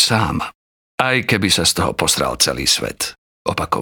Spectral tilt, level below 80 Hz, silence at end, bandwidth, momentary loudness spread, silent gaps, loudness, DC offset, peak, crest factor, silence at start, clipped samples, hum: -2.5 dB/octave; -42 dBFS; 0 s; over 20 kHz; 11 LU; 0.55-0.98 s, 3.18-3.45 s; -17 LUFS; under 0.1%; 0 dBFS; 18 dB; 0 s; under 0.1%; none